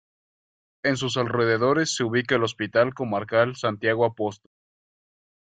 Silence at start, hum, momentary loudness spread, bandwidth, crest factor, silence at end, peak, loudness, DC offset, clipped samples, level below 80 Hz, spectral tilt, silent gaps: 0.85 s; none; 5 LU; 9.4 kHz; 20 dB; 1.1 s; -6 dBFS; -24 LUFS; under 0.1%; under 0.1%; -64 dBFS; -4.5 dB/octave; none